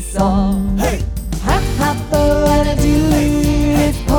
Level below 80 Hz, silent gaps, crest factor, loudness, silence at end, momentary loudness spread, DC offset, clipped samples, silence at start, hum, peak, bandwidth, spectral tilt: -20 dBFS; none; 12 dB; -15 LUFS; 0 s; 5 LU; under 0.1%; under 0.1%; 0 s; none; -2 dBFS; over 20 kHz; -6 dB/octave